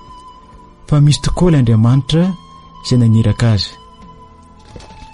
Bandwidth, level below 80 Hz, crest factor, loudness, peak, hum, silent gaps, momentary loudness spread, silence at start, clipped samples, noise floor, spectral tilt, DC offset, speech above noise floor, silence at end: 11.5 kHz; -30 dBFS; 14 dB; -13 LUFS; -2 dBFS; none; none; 8 LU; 0.1 s; under 0.1%; -40 dBFS; -6.5 dB/octave; under 0.1%; 29 dB; 0.1 s